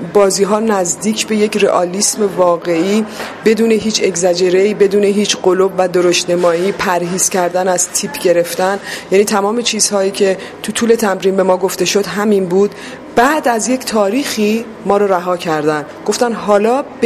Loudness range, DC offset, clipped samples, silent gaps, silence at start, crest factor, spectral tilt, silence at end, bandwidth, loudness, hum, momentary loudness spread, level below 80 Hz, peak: 2 LU; under 0.1%; under 0.1%; none; 0 s; 14 dB; -3.5 dB/octave; 0 s; 15.5 kHz; -13 LUFS; none; 5 LU; -52 dBFS; 0 dBFS